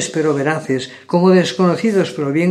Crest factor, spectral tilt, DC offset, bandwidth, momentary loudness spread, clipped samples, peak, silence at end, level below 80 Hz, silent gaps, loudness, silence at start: 14 dB; -6 dB/octave; under 0.1%; 11.5 kHz; 7 LU; under 0.1%; 0 dBFS; 0 s; -66 dBFS; none; -16 LUFS; 0 s